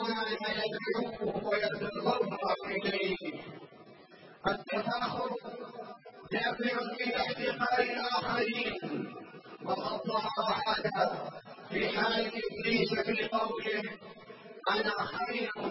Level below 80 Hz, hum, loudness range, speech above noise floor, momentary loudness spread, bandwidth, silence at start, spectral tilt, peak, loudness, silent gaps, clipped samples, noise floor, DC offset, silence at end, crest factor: -66 dBFS; none; 4 LU; 23 dB; 14 LU; 5.8 kHz; 0 s; -8 dB/octave; -14 dBFS; -33 LUFS; none; under 0.1%; -55 dBFS; under 0.1%; 0 s; 20 dB